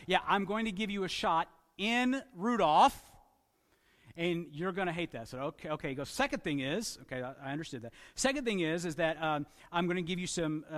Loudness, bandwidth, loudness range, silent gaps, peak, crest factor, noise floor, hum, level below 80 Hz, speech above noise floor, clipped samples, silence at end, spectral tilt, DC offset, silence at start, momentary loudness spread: -33 LUFS; 15.5 kHz; 6 LU; none; -12 dBFS; 22 dB; -72 dBFS; none; -62 dBFS; 39 dB; under 0.1%; 0 s; -4.5 dB/octave; under 0.1%; 0 s; 11 LU